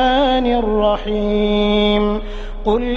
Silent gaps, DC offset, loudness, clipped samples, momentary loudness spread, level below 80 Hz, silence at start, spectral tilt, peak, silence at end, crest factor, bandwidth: none; under 0.1%; -17 LUFS; under 0.1%; 8 LU; -26 dBFS; 0 s; -7 dB/octave; -2 dBFS; 0 s; 14 dB; 7 kHz